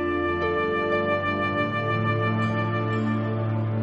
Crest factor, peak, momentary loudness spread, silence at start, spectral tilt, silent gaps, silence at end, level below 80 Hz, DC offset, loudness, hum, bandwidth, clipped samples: 12 dB; -12 dBFS; 2 LU; 0 s; -8.5 dB/octave; none; 0 s; -52 dBFS; under 0.1%; -25 LUFS; none; 6.4 kHz; under 0.1%